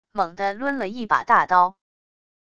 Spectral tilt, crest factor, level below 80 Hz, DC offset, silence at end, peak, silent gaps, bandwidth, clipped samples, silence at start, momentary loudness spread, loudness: -5 dB/octave; 20 dB; -60 dBFS; under 0.1%; 0.75 s; -2 dBFS; none; 8.2 kHz; under 0.1%; 0.15 s; 9 LU; -21 LUFS